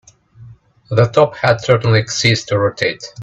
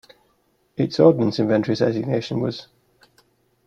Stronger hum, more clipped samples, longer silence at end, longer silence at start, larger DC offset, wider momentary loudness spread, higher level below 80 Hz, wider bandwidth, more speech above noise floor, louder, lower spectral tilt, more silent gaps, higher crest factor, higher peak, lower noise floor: neither; neither; second, 0 s vs 1.05 s; second, 0.4 s vs 0.8 s; neither; second, 6 LU vs 12 LU; first, -48 dBFS vs -60 dBFS; first, 8.4 kHz vs 7.4 kHz; second, 27 dB vs 45 dB; first, -15 LUFS vs -20 LUFS; second, -5 dB/octave vs -7.5 dB/octave; neither; about the same, 16 dB vs 20 dB; about the same, 0 dBFS vs -2 dBFS; second, -41 dBFS vs -65 dBFS